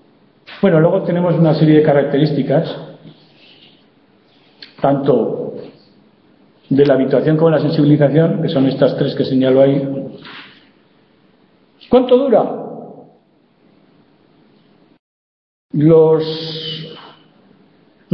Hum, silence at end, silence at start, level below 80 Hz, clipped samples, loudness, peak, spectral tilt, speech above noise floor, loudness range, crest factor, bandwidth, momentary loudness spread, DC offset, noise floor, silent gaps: none; 0 s; 0.5 s; -56 dBFS; under 0.1%; -14 LUFS; 0 dBFS; -10 dB/octave; 42 dB; 8 LU; 16 dB; 5.6 kHz; 17 LU; under 0.1%; -54 dBFS; 14.99-15.69 s